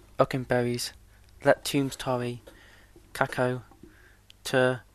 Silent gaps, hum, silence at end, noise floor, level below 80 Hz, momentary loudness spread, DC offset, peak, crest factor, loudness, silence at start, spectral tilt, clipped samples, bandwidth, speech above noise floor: none; none; 0.15 s; -56 dBFS; -56 dBFS; 12 LU; under 0.1%; -4 dBFS; 24 dB; -28 LUFS; 0.2 s; -5 dB/octave; under 0.1%; 13.5 kHz; 29 dB